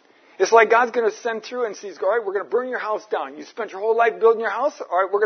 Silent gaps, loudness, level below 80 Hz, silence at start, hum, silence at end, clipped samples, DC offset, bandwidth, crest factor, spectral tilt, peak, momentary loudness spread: none; -21 LUFS; -86 dBFS; 0.4 s; none; 0 s; under 0.1%; under 0.1%; 6.6 kHz; 20 dB; -2.5 dB/octave; 0 dBFS; 12 LU